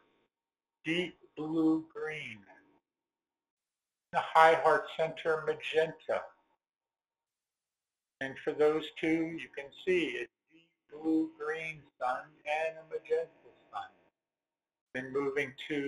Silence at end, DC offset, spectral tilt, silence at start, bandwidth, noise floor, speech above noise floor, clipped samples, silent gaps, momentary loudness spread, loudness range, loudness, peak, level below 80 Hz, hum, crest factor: 0 s; under 0.1%; -5.5 dB/octave; 0.85 s; 11.5 kHz; under -90 dBFS; over 58 dB; under 0.1%; 3.50-3.57 s, 14.81-14.87 s; 15 LU; 8 LU; -33 LUFS; -8 dBFS; -76 dBFS; none; 26 dB